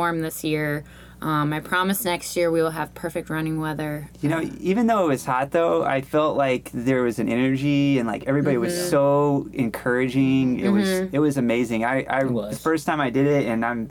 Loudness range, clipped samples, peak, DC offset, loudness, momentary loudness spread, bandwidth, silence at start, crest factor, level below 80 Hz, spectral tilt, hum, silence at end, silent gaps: 3 LU; under 0.1%; -8 dBFS; under 0.1%; -22 LUFS; 7 LU; 19 kHz; 0 s; 14 dB; -52 dBFS; -6 dB/octave; 60 Hz at -50 dBFS; 0 s; none